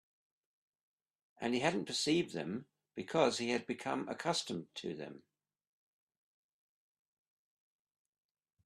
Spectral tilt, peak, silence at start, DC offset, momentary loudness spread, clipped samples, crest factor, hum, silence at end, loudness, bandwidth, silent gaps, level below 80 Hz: -4 dB/octave; -16 dBFS; 1.4 s; under 0.1%; 14 LU; under 0.1%; 24 dB; none; 3.45 s; -37 LUFS; 13 kHz; none; -78 dBFS